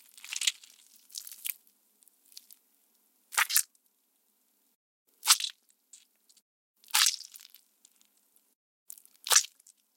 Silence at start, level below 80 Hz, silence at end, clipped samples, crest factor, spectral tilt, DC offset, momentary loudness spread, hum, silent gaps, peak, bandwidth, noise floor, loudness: 0.25 s; under -90 dBFS; 0.5 s; under 0.1%; 34 dB; 6.5 dB/octave; under 0.1%; 26 LU; none; 4.75-5.05 s, 6.42-6.74 s, 8.55-8.86 s; -2 dBFS; 17 kHz; -73 dBFS; -27 LUFS